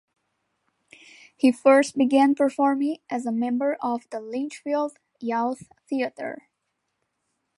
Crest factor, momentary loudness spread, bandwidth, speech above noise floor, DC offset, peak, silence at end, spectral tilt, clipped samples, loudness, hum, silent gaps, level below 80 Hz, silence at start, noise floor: 20 dB; 14 LU; 11.5 kHz; 55 dB; under 0.1%; -6 dBFS; 1.25 s; -4.5 dB/octave; under 0.1%; -24 LUFS; none; none; -78 dBFS; 1.45 s; -78 dBFS